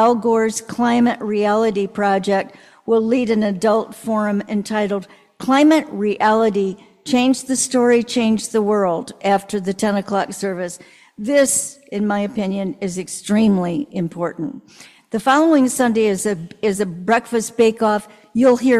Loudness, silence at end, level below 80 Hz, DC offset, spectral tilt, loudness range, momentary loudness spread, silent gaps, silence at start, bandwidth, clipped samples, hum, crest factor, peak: -18 LUFS; 0 s; -58 dBFS; under 0.1%; -4.5 dB/octave; 3 LU; 10 LU; none; 0 s; 14 kHz; under 0.1%; none; 14 dB; -4 dBFS